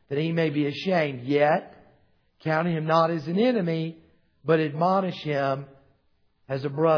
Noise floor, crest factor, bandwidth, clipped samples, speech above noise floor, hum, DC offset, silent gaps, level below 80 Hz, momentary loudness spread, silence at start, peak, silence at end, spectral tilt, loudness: -66 dBFS; 18 dB; 5.4 kHz; under 0.1%; 43 dB; none; under 0.1%; none; -70 dBFS; 9 LU; 0.1 s; -8 dBFS; 0 s; -8 dB/octave; -25 LUFS